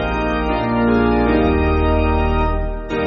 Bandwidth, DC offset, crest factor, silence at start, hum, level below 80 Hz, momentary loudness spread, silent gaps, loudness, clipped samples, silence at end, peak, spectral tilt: 6.6 kHz; under 0.1%; 12 dB; 0 s; none; -22 dBFS; 5 LU; none; -17 LUFS; under 0.1%; 0 s; -4 dBFS; -6 dB/octave